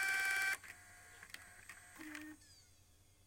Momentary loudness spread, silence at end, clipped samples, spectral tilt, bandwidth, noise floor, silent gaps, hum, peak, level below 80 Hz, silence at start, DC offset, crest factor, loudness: 23 LU; 0.65 s; under 0.1%; -0.5 dB/octave; 17 kHz; -68 dBFS; none; none; -24 dBFS; -74 dBFS; 0 s; under 0.1%; 20 dB; -39 LUFS